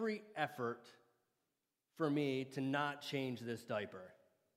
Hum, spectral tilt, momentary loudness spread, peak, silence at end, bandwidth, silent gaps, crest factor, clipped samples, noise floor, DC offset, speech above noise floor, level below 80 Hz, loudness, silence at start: none; -6 dB/octave; 12 LU; -22 dBFS; 0.45 s; 15.5 kHz; none; 20 dB; under 0.1%; -89 dBFS; under 0.1%; 48 dB; -88 dBFS; -41 LUFS; 0 s